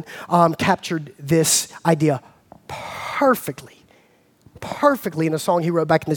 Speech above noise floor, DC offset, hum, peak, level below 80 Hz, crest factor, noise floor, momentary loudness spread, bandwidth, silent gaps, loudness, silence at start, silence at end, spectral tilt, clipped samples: 37 dB; under 0.1%; none; -2 dBFS; -58 dBFS; 20 dB; -57 dBFS; 15 LU; 19.5 kHz; none; -20 LUFS; 0 s; 0 s; -4.5 dB/octave; under 0.1%